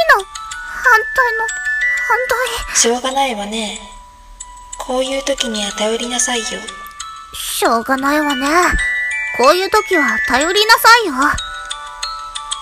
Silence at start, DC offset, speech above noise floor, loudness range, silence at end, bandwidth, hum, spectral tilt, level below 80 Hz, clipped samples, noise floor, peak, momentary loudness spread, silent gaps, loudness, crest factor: 0 s; under 0.1%; 21 dB; 7 LU; 0 s; 16.5 kHz; none; -1.5 dB/octave; -38 dBFS; 0.1%; -36 dBFS; 0 dBFS; 15 LU; none; -14 LUFS; 16 dB